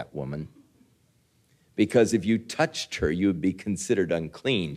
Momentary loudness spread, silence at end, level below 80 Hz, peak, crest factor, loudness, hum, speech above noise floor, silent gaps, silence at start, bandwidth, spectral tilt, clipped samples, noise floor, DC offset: 13 LU; 0 s; -52 dBFS; -8 dBFS; 20 dB; -26 LUFS; none; 40 dB; none; 0 s; 14.5 kHz; -5.5 dB/octave; under 0.1%; -65 dBFS; under 0.1%